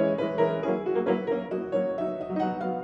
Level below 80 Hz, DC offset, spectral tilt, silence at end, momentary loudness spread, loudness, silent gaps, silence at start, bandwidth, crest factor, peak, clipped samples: -64 dBFS; under 0.1%; -8.5 dB/octave; 0 s; 4 LU; -28 LUFS; none; 0 s; 7.4 kHz; 16 dB; -12 dBFS; under 0.1%